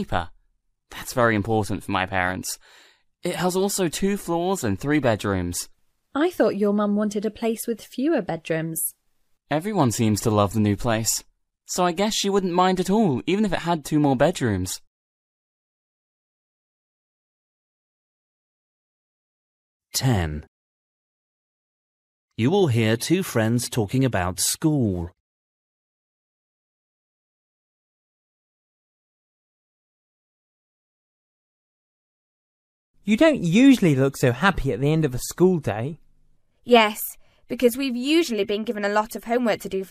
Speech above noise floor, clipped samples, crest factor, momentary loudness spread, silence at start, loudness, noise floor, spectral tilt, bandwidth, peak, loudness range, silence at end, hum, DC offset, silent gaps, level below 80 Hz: 46 dB; under 0.1%; 22 dB; 11 LU; 0 s; -22 LUFS; -68 dBFS; -5 dB/octave; 15.5 kHz; -4 dBFS; 10 LU; 0.05 s; none; under 0.1%; 14.87-19.80 s, 20.48-22.28 s, 25.20-32.94 s; -48 dBFS